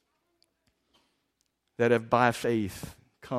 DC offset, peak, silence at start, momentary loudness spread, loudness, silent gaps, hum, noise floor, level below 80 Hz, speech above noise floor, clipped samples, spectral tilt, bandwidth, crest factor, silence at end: under 0.1%; -8 dBFS; 1.8 s; 21 LU; -27 LUFS; none; none; -77 dBFS; -62 dBFS; 51 dB; under 0.1%; -6 dB/octave; 15.5 kHz; 24 dB; 0 s